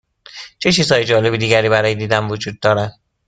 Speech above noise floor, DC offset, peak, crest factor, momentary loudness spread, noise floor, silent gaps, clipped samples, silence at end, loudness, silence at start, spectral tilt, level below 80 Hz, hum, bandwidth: 22 dB; under 0.1%; 0 dBFS; 16 dB; 11 LU; -38 dBFS; none; under 0.1%; 0.4 s; -15 LUFS; 0.35 s; -4.5 dB/octave; -48 dBFS; none; 9.4 kHz